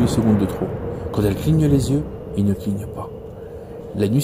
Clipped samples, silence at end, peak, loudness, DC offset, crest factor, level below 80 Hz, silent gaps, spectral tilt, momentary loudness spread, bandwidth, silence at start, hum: under 0.1%; 0 s; -6 dBFS; -21 LUFS; under 0.1%; 14 dB; -36 dBFS; none; -7.5 dB/octave; 18 LU; 16 kHz; 0 s; none